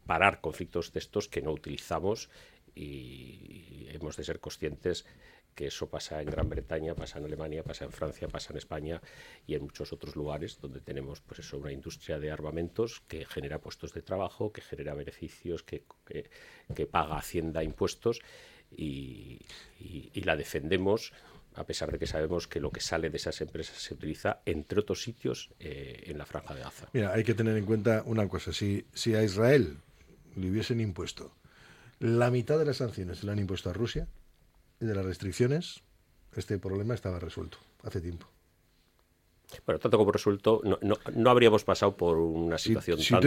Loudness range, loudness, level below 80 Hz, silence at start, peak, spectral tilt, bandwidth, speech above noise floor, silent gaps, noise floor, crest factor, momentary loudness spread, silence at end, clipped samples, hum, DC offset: 11 LU; -32 LUFS; -52 dBFS; 0.05 s; -6 dBFS; -6 dB/octave; 16.5 kHz; 36 dB; none; -68 dBFS; 26 dB; 18 LU; 0 s; under 0.1%; none; under 0.1%